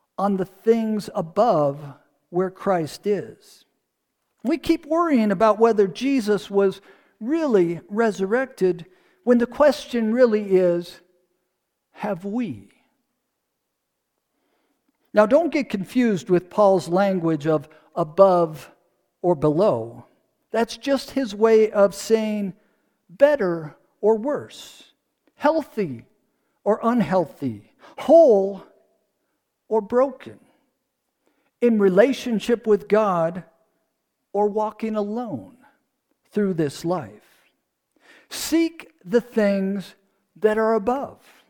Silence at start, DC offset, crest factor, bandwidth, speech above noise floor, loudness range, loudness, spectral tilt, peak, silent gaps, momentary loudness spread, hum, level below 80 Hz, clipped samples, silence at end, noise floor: 0.2 s; under 0.1%; 20 dB; 19 kHz; 57 dB; 7 LU; -21 LUFS; -6.5 dB/octave; -2 dBFS; none; 14 LU; none; -60 dBFS; under 0.1%; 0.35 s; -78 dBFS